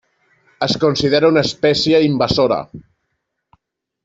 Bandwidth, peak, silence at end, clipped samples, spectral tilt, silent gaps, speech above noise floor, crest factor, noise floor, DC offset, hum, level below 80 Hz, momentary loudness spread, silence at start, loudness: 8 kHz; -2 dBFS; 1.25 s; under 0.1%; -5.5 dB/octave; none; 58 dB; 16 dB; -73 dBFS; under 0.1%; none; -46 dBFS; 9 LU; 0.6 s; -15 LUFS